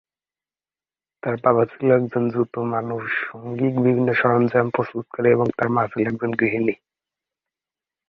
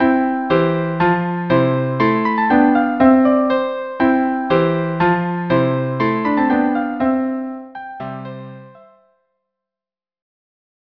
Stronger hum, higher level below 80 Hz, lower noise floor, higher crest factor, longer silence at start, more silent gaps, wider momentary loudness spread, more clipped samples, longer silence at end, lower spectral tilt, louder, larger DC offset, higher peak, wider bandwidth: neither; second, -60 dBFS vs -52 dBFS; about the same, under -90 dBFS vs under -90 dBFS; about the same, 20 dB vs 18 dB; first, 1.25 s vs 0 s; neither; second, 7 LU vs 15 LU; neither; second, 1.35 s vs 2.3 s; about the same, -10 dB/octave vs -9.5 dB/octave; second, -21 LUFS vs -16 LUFS; second, under 0.1% vs 0.2%; about the same, -2 dBFS vs 0 dBFS; about the same, 5.8 kHz vs 5.4 kHz